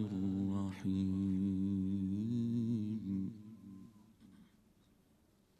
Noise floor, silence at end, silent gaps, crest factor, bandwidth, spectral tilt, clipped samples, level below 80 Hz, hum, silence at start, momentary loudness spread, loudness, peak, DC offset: -71 dBFS; 1.15 s; none; 12 dB; 8.4 kHz; -9 dB/octave; under 0.1%; -76 dBFS; none; 0 s; 18 LU; -38 LUFS; -26 dBFS; under 0.1%